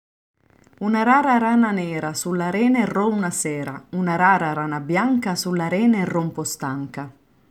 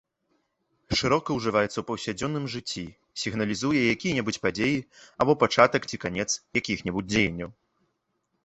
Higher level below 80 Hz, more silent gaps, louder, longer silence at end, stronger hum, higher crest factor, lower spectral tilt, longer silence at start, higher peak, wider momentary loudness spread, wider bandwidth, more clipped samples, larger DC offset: second, -64 dBFS vs -52 dBFS; neither; first, -21 LUFS vs -26 LUFS; second, 0.4 s vs 0.95 s; neither; second, 18 dB vs 24 dB; about the same, -5 dB/octave vs -4.5 dB/octave; about the same, 0.8 s vs 0.9 s; about the same, -4 dBFS vs -2 dBFS; about the same, 11 LU vs 11 LU; first, 15.5 kHz vs 8.4 kHz; neither; neither